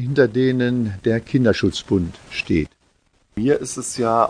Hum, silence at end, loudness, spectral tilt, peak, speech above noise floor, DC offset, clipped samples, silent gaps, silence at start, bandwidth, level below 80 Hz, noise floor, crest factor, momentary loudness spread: none; 0 s; -20 LUFS; -6 dB/octave; -2 dBFS; 42 dB; under 0.1%; under 0.1%; none; 0 s; 10 kHz; -44 dBFS; -61 dBFS; 18 dB; 9 LU